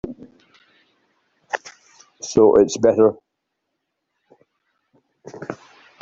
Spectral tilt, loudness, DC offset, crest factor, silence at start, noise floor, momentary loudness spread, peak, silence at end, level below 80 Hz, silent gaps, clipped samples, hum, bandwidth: -5 dB/octave; -17 LUFS; under 0.1%; 20 dB; 0.05 s; -77 dBFS; 26 LU; -2 dBFS; 0.5 s; -56 dBFS; none; under 0.1%; none; 7.8 kHz